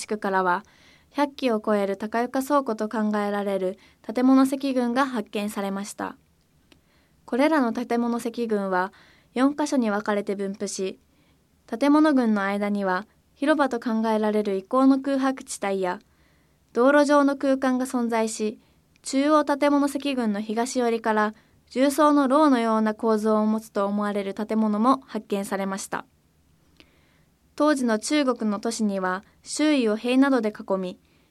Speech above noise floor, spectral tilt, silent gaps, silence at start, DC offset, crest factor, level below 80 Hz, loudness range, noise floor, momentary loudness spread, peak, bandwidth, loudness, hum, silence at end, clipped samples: 39 dB; -5 dB/octave; none; 0 s; under 0.1%; 18 dB; -68 dBFS; 5 LU; -62 dBFS; 10 LU; -6 dBFS; 14 kHz; -24 LUFS; none; 0.35 s; under 0.1%